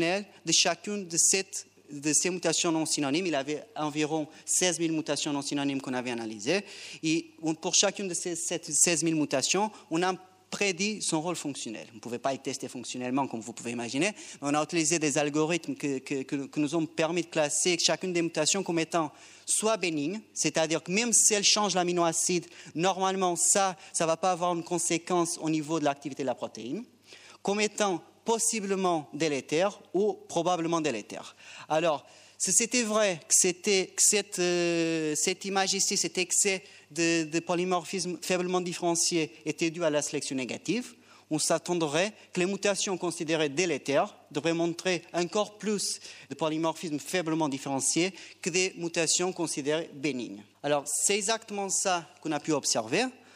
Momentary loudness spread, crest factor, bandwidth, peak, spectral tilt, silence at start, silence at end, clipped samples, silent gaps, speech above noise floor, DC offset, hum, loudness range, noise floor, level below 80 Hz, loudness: 11 LU; 20 dB; 15.5 kHz; -8 dBFS; -2.5 dB/octave; 0 s; 0.2 s; under 0.1%; none; 24 dB; under 0.1%; none; 5 LU; -53 dBFS; -82 dBFS; -28 LUFS